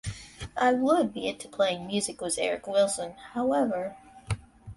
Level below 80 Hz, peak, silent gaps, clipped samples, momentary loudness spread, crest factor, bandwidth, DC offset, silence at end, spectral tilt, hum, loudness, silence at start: -52 dBFS; -10 dBFS; none; under 0.1%; 12 LU; 18 dB; 11.5 kHz; under 0.1%; 0 s; -4 dB/octave; none; -28 LUFS; 0.05 s